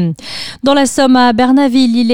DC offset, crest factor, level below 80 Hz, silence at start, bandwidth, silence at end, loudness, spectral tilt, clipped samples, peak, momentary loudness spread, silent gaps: under 0.1%; 10 dB; -46 dBFS; 0 s; 15.5 kHz; 0 s; -10 LUFS; -4.5 dB/octave; under 0.1%; 0 dBFS; 10 LU; none